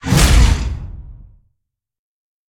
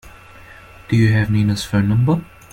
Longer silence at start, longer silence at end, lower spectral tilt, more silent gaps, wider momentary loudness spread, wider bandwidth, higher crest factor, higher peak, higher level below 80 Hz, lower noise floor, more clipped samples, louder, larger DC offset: about the same, 0.05 s vs 0.05 s; first, 1.35 s vs 0.3 s; second, -4.5 dB/octave vs -7 dB/octave; neither; first, 23 LU vs 5 LU; first, 17.5 kHz vs 14 kHz; about the same, 16 dB vs 14 dB; first, 0 dBFS vs -4 dBFS; first, -18 dBFS vs -42 dBFS; first, -75 dBFS vs -41 dBFS; neither; first, -14 LUFS vs -17 LUFS; neither